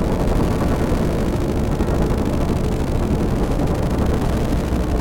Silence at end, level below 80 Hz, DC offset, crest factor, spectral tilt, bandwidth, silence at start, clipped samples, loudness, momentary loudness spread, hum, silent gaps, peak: 0 s; -22 dBFS; under 0.1%; 12 dB; -7.5 dB/octave; 17 kHz; 0 s; under 0.1%; -20 LUFS; 1 LU; none; none; -6 dBFS